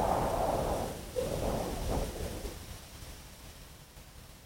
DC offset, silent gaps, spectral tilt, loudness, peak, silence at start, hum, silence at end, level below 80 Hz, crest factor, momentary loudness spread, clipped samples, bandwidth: under 0.1%; none; -5 dB/octave; -35 LUFS; -18 dBFS; 0 s; none; 0 s; -44 dBFS; 18 dB; 20 LU; under 0.1%; 16.5 kHz